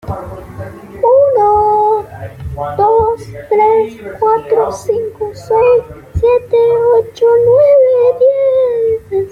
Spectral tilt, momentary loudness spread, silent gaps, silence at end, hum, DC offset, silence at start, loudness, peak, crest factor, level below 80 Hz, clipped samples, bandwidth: -7 dB/octave; 16 LU; none; 0 s; none; under 0.1%; 0.05 s; -11 LUFS; -2 dBFS; 10 dB; -38 dBFS; under 0.1%; 9.6 kHz